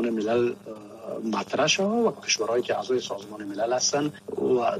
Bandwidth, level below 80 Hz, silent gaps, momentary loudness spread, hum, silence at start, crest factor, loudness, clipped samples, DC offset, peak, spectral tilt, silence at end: 14 kHz; -70 dBFS; none; 13 LU; none; 0 s; 16 dB; -26 LUFS; under 0.1%; under 0.1%; -10 dBFS; -3 dB/octave; 0 s